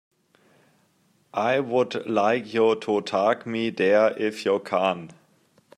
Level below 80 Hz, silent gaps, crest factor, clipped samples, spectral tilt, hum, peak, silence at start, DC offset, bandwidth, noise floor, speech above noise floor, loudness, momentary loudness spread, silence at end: -74 dBFS; none; 18 dB; under 0.1%; -5.5 dB/octave; none; -8 dBFS; 1.35 s; under 0.1%; 11.5 kHz; -65 dBFS; 42 dB; -24 LUFS; 6 LU; 0.65 s